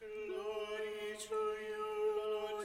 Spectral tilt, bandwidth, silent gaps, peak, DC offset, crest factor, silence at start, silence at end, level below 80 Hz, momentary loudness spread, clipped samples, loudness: -2.5 dB/octave; 15.5 kHz; none; -28 dBFS; under 0.1%; 12 dB; 0 s; 0 s; -72 dBFS; 5 LU; under 0.1%; -40 LUFS